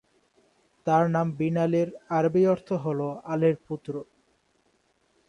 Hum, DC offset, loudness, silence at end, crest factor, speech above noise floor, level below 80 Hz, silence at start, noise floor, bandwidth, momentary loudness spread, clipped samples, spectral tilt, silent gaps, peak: none; under 0.1%; -26 LUFS; 1.25 s; 18 dB; 43 dB; -68 dBFS; 0.85 s; -68 dBFS; 10 kHz; 12 LU; under 0.1%; -8.5 dB/octave; none; -10 dBFS